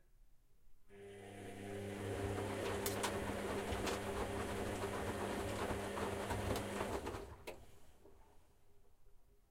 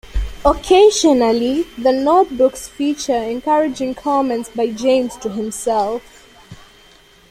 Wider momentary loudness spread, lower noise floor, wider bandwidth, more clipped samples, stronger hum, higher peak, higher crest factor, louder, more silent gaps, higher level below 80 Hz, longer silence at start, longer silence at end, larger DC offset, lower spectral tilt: about the same, 12 LU vs 11 LU; first, -64 dBFS vs -47 dBFS; about the same, 16.5 kHz vs 15.5 kHz; neither; neither; second, -26 dBFS vs -2 dBFS; about the same, 18 dB vs 14 dB; second, -43 LUFS vs -16 LUFS; neither; second, -56 dBFS vs -34 dBFS; about the same, 0.15 s vs 0.15 s; second, 0.1 s vs 0.75 s; neither; about the same, -4.5 dB/octave vs -4 dB/octave